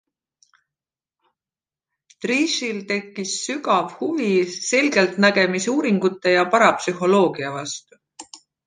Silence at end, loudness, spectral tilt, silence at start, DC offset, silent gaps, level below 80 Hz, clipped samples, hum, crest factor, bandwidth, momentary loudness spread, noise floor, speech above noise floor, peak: 0.3 s; -20 LUFS; -4 dB/octave; 2.2 s; under 0.1%; none; -72 dBFS; under 0.1%; none; 20 dB; 9.8 kHz; 11 LU; under -90 dBFS; over 70 dB; -2 dBFS